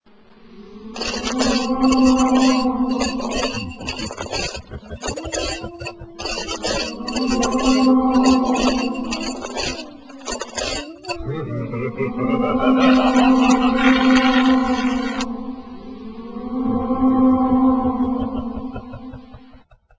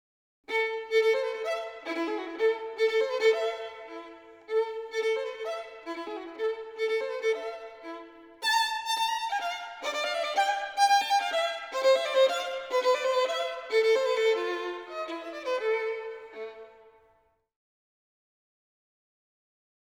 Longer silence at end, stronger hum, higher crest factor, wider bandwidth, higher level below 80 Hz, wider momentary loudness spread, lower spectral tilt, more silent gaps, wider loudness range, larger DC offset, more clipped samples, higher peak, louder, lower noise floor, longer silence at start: second, 0.6 s vs 3.15 s; neither; about the same, 18 dB vs 18 dB; second, 8 kHz vs over 20 kHz; first, -40 dBFS vs -76 dBFS; first, 18 LU vs 15 LU; first, -4.5 dB/octave vs 0 dB/octave; neither; about the same, 10 LU vs 9 LU; first, 0.3% vs under 0.1%; neither; first, -2 dBFS vs -12 dBFS; first, -19 LUFS vs -28 LUFS; second, -48 dBFS vs -68 dBFS; about the same, 0.45 s vs 0.5 s